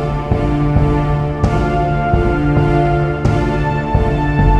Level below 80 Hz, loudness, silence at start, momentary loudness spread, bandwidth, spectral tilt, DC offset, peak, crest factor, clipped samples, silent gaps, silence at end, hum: -20 dBFS; -15 LUFS; 0 s; 3 LU; 8.4 kHz; -8.5 dB/octave; under 0.1%; 0 dBFS; 12 dB; under 0.1%; none; 0 s; none